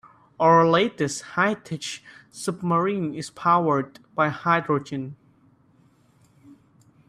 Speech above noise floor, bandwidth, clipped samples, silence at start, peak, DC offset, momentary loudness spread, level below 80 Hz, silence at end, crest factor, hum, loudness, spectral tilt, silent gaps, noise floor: 36 dB; 13 kHz; under 0.1%; 0.4 s; -4 dBFS; under 0.1%; 16 LU; -66 dBFS; 1.95 s; 20 dB; none; -23 LUFS; -5.5 dB/octave; none; -59 dBFS